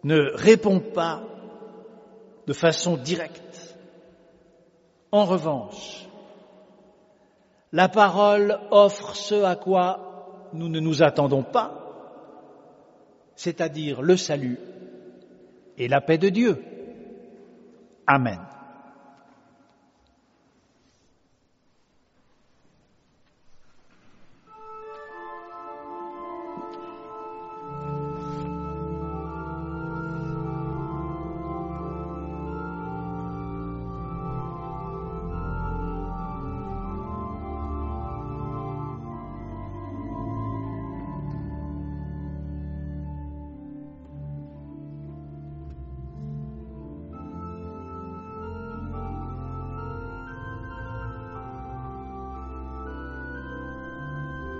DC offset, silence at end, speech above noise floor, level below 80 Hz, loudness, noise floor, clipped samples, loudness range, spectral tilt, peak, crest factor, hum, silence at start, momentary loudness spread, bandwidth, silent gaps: under 0.1%; 0 s; 44 dB; -44 dBFS; -27 LUFS; -65 dBFS; under 0.1%; 17 LU; -5 dB/octave; -2 dBFS; 26 dB; none; 0.05 s; 20 LU; 7.6 kHz; none